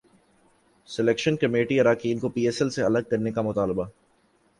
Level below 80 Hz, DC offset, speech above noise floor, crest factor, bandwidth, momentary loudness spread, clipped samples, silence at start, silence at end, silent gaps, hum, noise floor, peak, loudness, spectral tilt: -58 dBFS; under 0.1%; 40 dB; 18 dB; 11.5 kHz; 6 LU; under 0.1%; 0.9 s; 0.7 s; none; none; -64 dBFS; -8 dBFS; -24 LUFS; -6 dB/octave